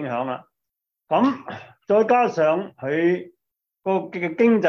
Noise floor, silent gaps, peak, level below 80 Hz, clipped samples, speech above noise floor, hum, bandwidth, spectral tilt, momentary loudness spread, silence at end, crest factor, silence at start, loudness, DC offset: -83 dBFS; none; -6 dBFS; -70 dBFS; under 0.1%; 63 dB; none; 6.8 kHz; -7.5 dB/octave; 14 LU; 0 s; 16 dB; 0 s; -22 LUFS; under 0.1%